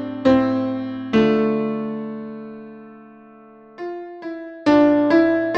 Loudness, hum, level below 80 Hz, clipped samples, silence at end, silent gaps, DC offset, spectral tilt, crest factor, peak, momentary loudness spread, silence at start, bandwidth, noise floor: -18 LUFS; none; -52 dBFS; under 0.1%; 0 s; none; under 0.1%; -7.5 dB/octave; 16 dB; -4 dBFS; 19 LU; 0 s; 7 kHz; -45 dBFS